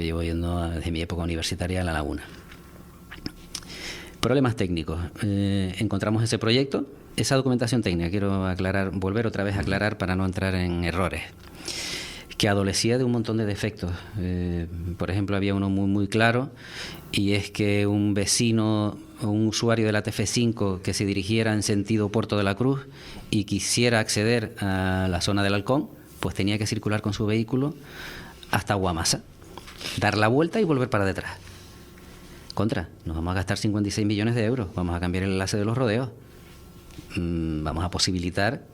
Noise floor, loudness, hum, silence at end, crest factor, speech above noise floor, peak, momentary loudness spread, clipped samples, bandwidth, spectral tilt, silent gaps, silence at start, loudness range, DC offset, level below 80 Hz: -46 dBFS; -25 LUFS; none; 0 s; 22 dB; 22 dB; -4 dBFS; 13 LU; under 0.1%; 16 kHz; -5 dB/octave; none; 0 s; 4 LU; under 0.1%; -48 dBFS